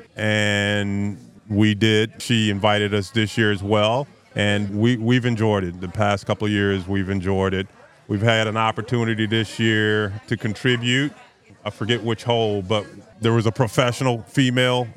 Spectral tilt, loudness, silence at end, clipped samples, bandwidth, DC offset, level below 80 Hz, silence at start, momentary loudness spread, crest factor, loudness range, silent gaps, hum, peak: -5.5 dB/octave; -21 LUFS; 0.05 s; under 0.1%; 13 kHz; under 0.1%; -60 dBFS; 0 s; 8 LU; 20 dB; 2 LU; none; none; 0 dBFS